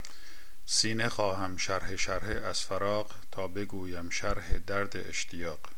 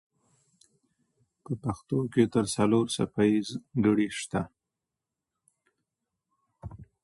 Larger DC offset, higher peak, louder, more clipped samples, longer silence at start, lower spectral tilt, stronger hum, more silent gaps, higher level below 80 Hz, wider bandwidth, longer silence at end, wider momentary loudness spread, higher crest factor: first, 2% vs under 0.1%; about the same, -10 dBFS vs -10 dBFS; second, -33 LUFS vs -28 LUFS; neither; second, 0 s vs 1.5 s; second, -3 dB/octave vs -6 dB/octave; neither; neither; first, -44 dBFS vs -58 dBFS; first, 17 kHz vs 11.5 kHz; second, 0 s vs 0.2 s; second, 11 LU vs 18 LU; about the same, 22 dB vs 20 dB